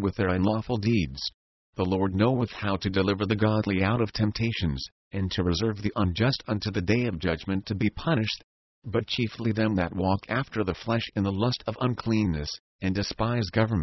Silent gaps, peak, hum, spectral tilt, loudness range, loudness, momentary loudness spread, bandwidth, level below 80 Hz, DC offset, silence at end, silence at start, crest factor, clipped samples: 1.34-1.73 s, 4.92-5.11 s, 8.44-8.82 s, 12.60-12.79 s; -10 dBFS; none; -7 dB/octave; 2 LU; -27 LUFS; 6 LU; 6.2 kHz; -42 dBFS; under 0.1%; 0 s; 0 s; 18 dB; under 0.1%